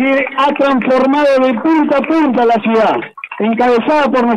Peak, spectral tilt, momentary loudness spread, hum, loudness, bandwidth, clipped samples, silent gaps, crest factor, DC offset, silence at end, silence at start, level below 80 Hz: -4 dBFS; -6 dB/octave; 4 LU; none; -12 LUFS; 10 kHz; under 0.1%; none; 8 dB; under 0.1%; 0 s; 0 s; -54 dBFS